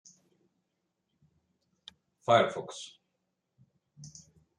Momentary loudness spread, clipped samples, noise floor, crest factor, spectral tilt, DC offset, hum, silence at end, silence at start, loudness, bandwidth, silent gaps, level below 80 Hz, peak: 25 LU; under 0.1%; -82 dBFS; 26 dB; -4.5 dB/octave; under 0.1%; none; 0.5 s; 2.3 s; -29 LUFS; 10.5 kHz; none; -80 dBFS; -10 dBFS